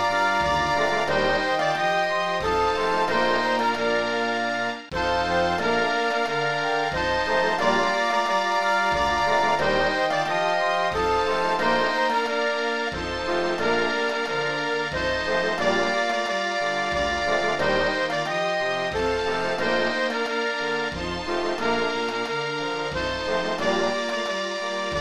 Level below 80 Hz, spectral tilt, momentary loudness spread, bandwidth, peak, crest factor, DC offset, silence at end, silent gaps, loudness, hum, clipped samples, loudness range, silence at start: -46 dBFS; -3.5 dB/octave; 5 LU; 13.5 kHz; -10 dBFS; 14 dB; 0.5%; 0 s; none; -23 LUFS; none; under 0.1%; 3 LU; 0 s